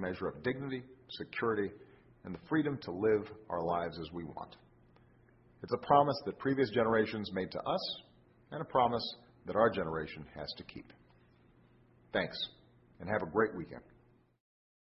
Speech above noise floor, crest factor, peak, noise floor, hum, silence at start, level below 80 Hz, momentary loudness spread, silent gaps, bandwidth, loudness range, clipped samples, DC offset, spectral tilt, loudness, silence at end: 32 dB; 24 dB; -12 dBFS; -66 dBFS; none; 0 s; -64 dBFS; 17 LU; none; 5.8 kHz; 6 LU; under 0.1%; under 0.1%; -4 dB/octave; -35 LUFS; 1.1 s